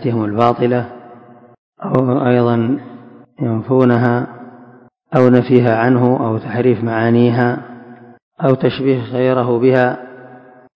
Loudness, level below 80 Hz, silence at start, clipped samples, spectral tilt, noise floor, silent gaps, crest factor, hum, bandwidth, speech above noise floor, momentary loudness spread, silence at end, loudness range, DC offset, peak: -15 LUFS; -54 dBFS; 0 s; 0.2%; -10 dB/octave; -44 dBFS; 1.58-1.72 s, 8.22-8.31 s; 16 dB; none; 5.4 kHz; 31 dB; 11 LU; 0.4 s; 3 LU; under 0.1%; 0 dBFS